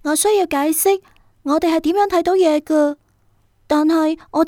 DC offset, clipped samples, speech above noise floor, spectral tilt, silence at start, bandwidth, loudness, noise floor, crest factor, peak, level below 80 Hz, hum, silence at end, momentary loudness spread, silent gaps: under 0.1%; under 0.1%; 42 dB; -2.5 dB/octave; 0.05 s; 18 kHz; -17 LUFS; -58 dBFS; 12 dB; -4 dBFS; -52 dBFS; none; 0 s; 6 LU; none